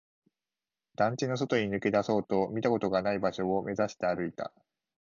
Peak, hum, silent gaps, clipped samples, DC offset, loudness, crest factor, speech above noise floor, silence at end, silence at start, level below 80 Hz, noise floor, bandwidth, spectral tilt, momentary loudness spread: -14 dBFS; none; none; under 0.1%; under 0.1%; -30 LUFS; 18 dB; over 60 dB; 0.55 s; 1 s; -64 dBFS; under -90 dBFS; 7.4 kHz; -6 dB/octave; 6 LU